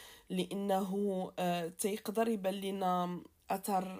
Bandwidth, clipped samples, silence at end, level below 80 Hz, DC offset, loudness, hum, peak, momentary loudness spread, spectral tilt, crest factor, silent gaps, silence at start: 16 kHz; under 0.1%; 0 s; -74 dBFS; under 0.1%; -36 LUFS; none; -20 dBFS; 6 LU; -5.5 dB/octave; 14 dB; none; 0 s